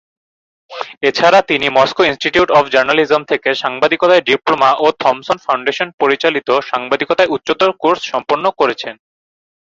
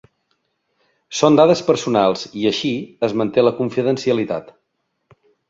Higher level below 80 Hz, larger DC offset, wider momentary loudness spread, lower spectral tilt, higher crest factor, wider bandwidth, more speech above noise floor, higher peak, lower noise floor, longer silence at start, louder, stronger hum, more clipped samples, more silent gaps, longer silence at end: first, -54 dBFS vs -60 dBFS; neither; second, 7 LU vs 10 LU; second, -4 dB/octave vs -5.5 dB/octave; about the same, 14 dB vs 18 dB; about the same, 7.8 kHz vs 7.8 kHz; first, over 76 dB vs 55 dB; about the same, 0 dBFS vs -2 dBFS; first, under -90 dBFS vs -72 dBFS; second, 0.7 s vs 1.1 s; first, -13 LUFS vs -18 LUFS; neither; neither; first, 5.94-5.98 s vs none; second, 0.8 s vs 1 s